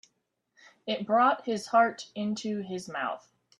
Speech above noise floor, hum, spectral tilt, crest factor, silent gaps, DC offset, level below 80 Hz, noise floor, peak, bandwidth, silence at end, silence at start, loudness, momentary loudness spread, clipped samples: 50 dB; none; -4.5 dB/octave; 20 dB; none; under 0.1%; -78 dBFS; -78 dBFS; -10 dBFS; 11.5 kHz; 0.4 s; 0.85 s; -29 LUFS; 11 LU; under 0.1%